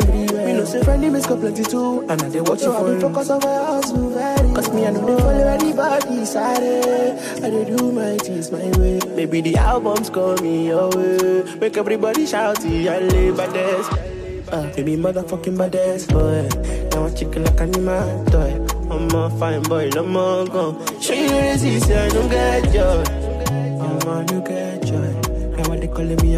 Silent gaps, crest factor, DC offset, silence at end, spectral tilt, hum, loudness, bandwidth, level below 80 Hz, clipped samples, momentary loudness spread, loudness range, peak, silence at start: none; 12 dB; under 0.1%; 0 s; -5.5 dB/octave; none; -19 LUFS; 15.5 kHz; -24 dBFS; under 0.1%; 6 LU; 3 LU; -6 dBFS; 0 s